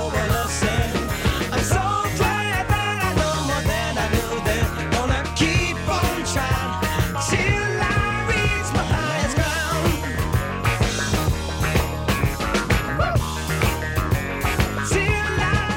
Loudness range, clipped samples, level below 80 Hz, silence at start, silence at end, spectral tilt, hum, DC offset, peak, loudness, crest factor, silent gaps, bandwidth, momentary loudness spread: 1 LU; under 0.1%; -30 dBFS; 0 s; 0 s; -4.5 dB/octave; none; under 0.1%; -8 dBFS; -22 LUFS; 14 dB; none; 17 kHz; 3 LU